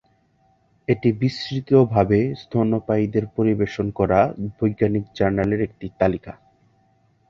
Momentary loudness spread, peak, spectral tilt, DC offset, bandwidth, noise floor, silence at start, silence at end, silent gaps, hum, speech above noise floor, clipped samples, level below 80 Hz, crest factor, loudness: 7 LU; -2 dBFS; -8.5 dB/octave; under 0.1%; 7.4 kHz; -62 dBFS; 0.9 s; 0.95 s; none; none; 41 dB; under 0.1%; -46 dBFS; 18 dB; -21 LUFS